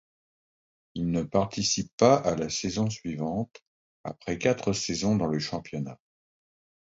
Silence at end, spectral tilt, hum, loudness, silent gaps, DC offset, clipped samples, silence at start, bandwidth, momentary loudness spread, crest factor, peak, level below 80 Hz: 0.9 s; -5 dB/octave; none; -28 LUFS; 1.93-1.98 s, 3.62-4.04 s; under 0.1%; under 0.1%; 0.95 s; 8 kHz; 16 LU; 22 dB; -6 dBFS; -54 dBFS